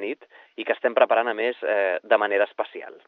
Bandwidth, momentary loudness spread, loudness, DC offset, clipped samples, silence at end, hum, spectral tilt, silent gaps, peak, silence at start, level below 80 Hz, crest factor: 4.3 kHz; 13 LU; -23 LUFS; under 0.1%; under 0.1%; 0.15 s; none; -5.5 dB/octave; none; -4 dBFS; 0 s; under -90 dBFS; 20 dB